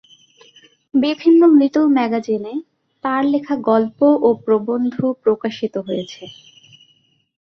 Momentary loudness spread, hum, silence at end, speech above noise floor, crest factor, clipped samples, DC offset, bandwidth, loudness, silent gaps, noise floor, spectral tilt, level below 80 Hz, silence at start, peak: 14 LU; none; 1.25 s; 43 dB; 14 dB; under 0.1%; under 0.1%; 6.4 kHz; -17 LUFS; none; -59 dBFS; -7 dB/octave; -64 dBFS; 0.95 s; -2 dBFS